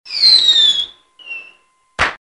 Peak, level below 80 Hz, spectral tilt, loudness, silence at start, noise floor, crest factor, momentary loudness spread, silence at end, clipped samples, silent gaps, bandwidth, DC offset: 0 dBFS; -44 dBFS; 0.5 dB/octave; -10 LUFS; 0.05 s; -52 dBFS; 16 dB; 23 LU; 0.05 s; under 0.1%; none; 11.5 kHz; under 0.1%